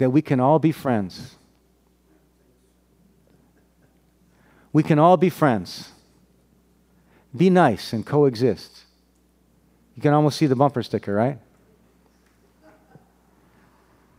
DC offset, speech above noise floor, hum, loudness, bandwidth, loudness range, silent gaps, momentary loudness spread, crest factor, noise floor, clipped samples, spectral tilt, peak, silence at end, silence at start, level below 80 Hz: under 0.1%; 42 dB; none; -20 LUFS; 16 kHz; 9 LU; none; 21 LU; 22 dB; -61 dBFS; under 0.1%; -7.5 dB/octave; -2 dBFS; 2.8 s; 0 s; -62 dBFS